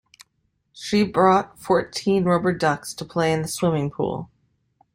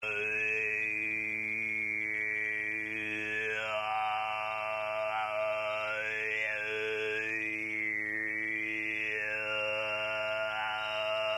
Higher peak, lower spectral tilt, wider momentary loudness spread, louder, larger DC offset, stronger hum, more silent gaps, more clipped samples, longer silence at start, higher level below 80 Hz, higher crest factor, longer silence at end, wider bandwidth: first, -4 dBFS vs -22 dBFS; first, -5.5 dB/octave vs -3.5 dB/octave; first, 10 LU vs 3 LU; first, -22 LUFS vs -32 LUFS; neither; neither; neither; neither; first, 0.75 s vs 0 s; first, -56 dBFS vs -72 dBFS; first, 18 dB vs 12 dB; first, 0.7 s vs 0 s; first, 16 kHz vs 13 kHz